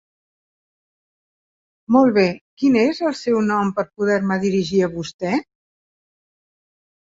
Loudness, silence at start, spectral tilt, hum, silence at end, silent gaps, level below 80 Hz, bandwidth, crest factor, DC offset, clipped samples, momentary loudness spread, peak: -19 LUFS; 1.9 s; -6.5 dB/octave; none; 1.7 s; 2.41-2.57 s, 5.14-5.19 s; -60 dBFS; 7.8 kHz; 18 dB; under 0.1%; under 0.1%; 8 LU; -2 dBFS